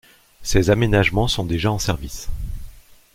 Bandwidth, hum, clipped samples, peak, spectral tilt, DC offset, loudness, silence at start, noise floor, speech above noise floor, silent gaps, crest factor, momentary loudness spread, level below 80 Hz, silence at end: 16.5 kHz; none; under 0.1%; -2 dBFS; -5 dB/octave; under 0.1%; -20 LUFS; 0.4 s; -40 dBFS; 21 dB; none; 20 dB; 16 LU; -30 dBFS; 0.4 s